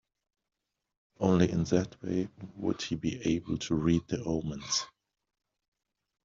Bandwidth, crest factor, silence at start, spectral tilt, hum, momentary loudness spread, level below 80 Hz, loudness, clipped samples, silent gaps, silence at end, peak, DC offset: 7.6 kHz; 22 dB; 1.2 s; -6 dB/octave; none; 8 LU; -56 dBFS; -31 LUFS; under 0.1%; none; 1.35 s; -10 dBFS; under 0.1%